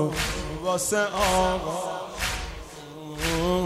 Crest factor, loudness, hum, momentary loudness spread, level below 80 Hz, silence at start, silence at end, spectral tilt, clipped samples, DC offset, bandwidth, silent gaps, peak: 16 dB; -26 LUFS; none; 16 LU; -38 dBFS; 0 s; 0 s; -3.5 dB/octave; under 0.1%; under 0.1%; 16 kHz; none; -10 dBFS